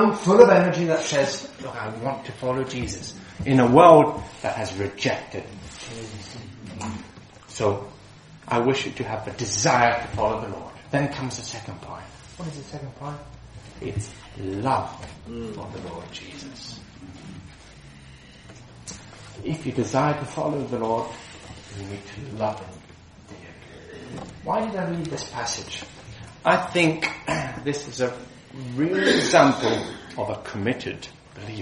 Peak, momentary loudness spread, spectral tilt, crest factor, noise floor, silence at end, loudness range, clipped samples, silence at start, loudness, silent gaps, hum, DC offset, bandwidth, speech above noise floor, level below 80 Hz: 0 dBFS; 23 LU; -5 dB/octave; 24 dB; -47 dBFS; 0 s; 16 LU; under 0.1%; 0 s; -23 LUFS; none; none; under 0.1%; 11 kHz; 24 dB; -52 dBFS